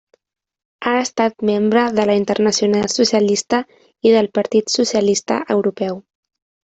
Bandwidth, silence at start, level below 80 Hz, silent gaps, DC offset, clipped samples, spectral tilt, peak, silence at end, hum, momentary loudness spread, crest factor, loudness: 8.2 kHz; 0.8 s; -58 dBFS; none; under 0.1%; under 0.1%; -4 dB/octave; -2 dBFS; 0.7 s; none; 6 LU; 14 dB; -17 LUFS